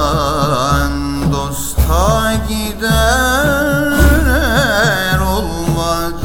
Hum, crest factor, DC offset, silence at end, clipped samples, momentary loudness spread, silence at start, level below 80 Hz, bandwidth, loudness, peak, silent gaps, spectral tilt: none; 12 dB; under 0.1%; 0 s; under 0.1%; 6 LU; 0 s; -20 dBFS; 17 kHz; -14 LUFS; 0 dBFS; none; -4.5 dB/octave